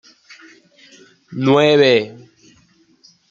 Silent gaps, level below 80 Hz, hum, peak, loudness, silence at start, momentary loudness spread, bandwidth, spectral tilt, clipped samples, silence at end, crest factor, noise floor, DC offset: none; -62 dBFS; none; -2 dBFS; -14 LUFS; 1.3 s; 20 LU; 7.6 kHz; -6 dB/octave; under 0.1%; 1.2 s; 18 dB; -55 dBFS; under 0.1%